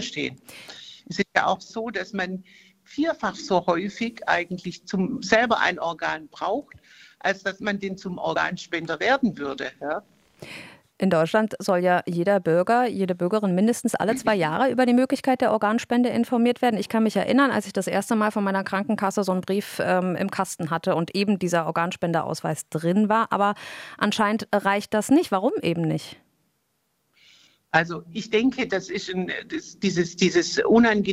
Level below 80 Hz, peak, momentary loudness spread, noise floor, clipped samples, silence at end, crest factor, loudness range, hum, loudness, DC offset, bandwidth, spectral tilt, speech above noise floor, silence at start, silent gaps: -62 dBFS; -2 dBFS; 10 LU; -72 dBFS; under 0.1%; 0 s; 22 dB; 5 LU; none; -24 LUFS; under 0.1%; 15.5 kHz; -5 dB/octave; 49 dB; 0 s; none